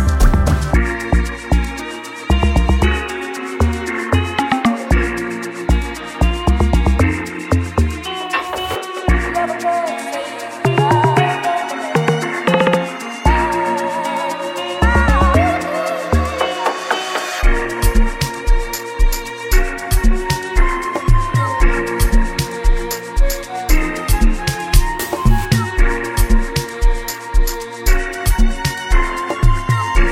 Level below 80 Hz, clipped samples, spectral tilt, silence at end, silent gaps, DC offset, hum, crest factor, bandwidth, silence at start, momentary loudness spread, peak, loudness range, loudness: -18 dBFS; under 0.1%; -5.5 dB/octave; 0 s; none; under 0.1%; none; 16 dB; 16.5 kHz; 0 s; 7 LU; 0 dBFS; 3 LU; -18 LUFS